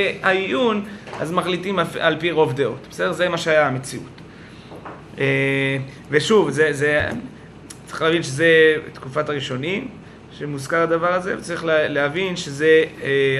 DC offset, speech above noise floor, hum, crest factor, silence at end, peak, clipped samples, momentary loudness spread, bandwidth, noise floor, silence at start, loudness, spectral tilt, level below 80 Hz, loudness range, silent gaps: under 0.1%; 21 dB; none; 20 dB; 0 s; 0 dBFS; under 0.1%; 17 LU; 12.5 kHz; -40 dBFS; 0 s; -20 LUFS; -5 dB/octave; -54 dBFS; 3 LU; none